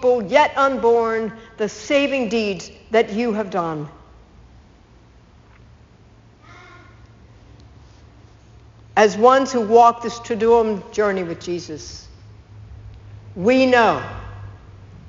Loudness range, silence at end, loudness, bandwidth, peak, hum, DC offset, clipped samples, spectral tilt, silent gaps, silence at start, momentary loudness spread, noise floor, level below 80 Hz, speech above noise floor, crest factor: 8 LU; 0 s; -18 LUFS; 7.6 kHz; 0 dBFS; none; under 0.1%; under 0.1%; -3.5 dB/octave; none; 0 s; 21 LU; -49 dBFS; -48 dBFS; 31 dB; 20 dB